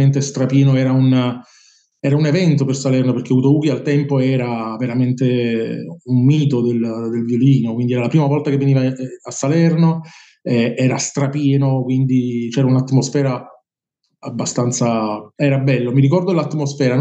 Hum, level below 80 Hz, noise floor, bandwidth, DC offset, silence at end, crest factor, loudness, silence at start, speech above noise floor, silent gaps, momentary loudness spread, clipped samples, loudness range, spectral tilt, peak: none; -72 dBFS; -73 dBFS; 8.4 kHz; under 0.1%; 0 s; 14 dB; -17 LUFS; 0 s; 58 dB; none; 8 LU; under 0.1%; 2 LU; -7 dB/octave; -2 dBFS